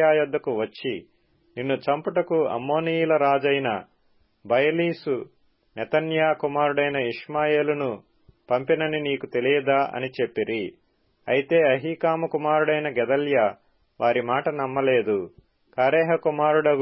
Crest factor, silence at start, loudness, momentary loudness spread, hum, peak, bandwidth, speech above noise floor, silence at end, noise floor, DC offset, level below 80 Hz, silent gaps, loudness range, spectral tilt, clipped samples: 16 dB; 0 s; -23 LUFS; 10 LU; none; -8 dBFS; 5.8 kHz; 41 dB; 0 s; -64 dBFS; under 0.1%; -68 dBFS; none; 2 LU; -10 dB/octave; under 0.1%